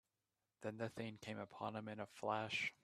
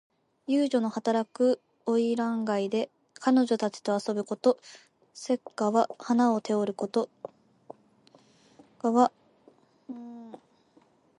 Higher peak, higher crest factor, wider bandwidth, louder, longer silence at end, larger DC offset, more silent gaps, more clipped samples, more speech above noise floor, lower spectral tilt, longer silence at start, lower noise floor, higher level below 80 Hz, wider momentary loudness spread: second, -26 dBFS vs -8 dBFS; about the same, 20 dB vs 20 dB; first, 14 kHz vs 11 kHz; second, -46 LUFS vs -28 LUFS; second, 0.1 s vs 0.8 s; neither; neither; neither; first, over 44 dB vs 36 dB; about the same, -5 dB/octave vs -5.5 dB/octave; about the same, 0.6 s vs 0.5 s; first, under -90 dBFS vs -63 dBFS; about the same, -84 dBFS vs -80 dBFS; second, 9 LU vs 18 LU